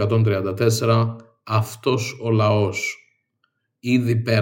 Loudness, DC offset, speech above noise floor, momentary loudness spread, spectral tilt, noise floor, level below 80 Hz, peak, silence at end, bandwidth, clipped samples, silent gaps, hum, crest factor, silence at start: -21 LUFS; under 0.1%; 52 dB; 9 LU; -6 dB/octave; -71 dBFS; -66 dBFS; -4 dBFS; 0 s; 17 kHz; under 0.1%; none; none; 18 dB; 0 s